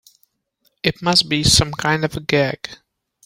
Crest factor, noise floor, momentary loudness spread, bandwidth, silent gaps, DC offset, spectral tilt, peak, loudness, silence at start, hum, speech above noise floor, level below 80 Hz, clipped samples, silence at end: 20 dB; -66 dBFS; 9 LU; 16.5 kHz; none; under 0.1%; -3.5 dB/octave; 0 dBFS; -17 LUFS; 0.85 s; none; 48 dB; -40 dBFS; under 0.1%; 0.5 s